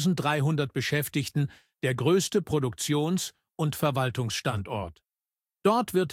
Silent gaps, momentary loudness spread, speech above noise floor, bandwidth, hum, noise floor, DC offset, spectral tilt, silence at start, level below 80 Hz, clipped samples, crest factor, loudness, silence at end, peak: none; 8 LU; over 63 dB; 16.5 kHz; none; under -90 dBFS; under 0.1%; -5 dB/octave; 0 s; -58 dBFS; under 0.1%; 18 dB; -28 LUFS; 0 s; -8 dBFS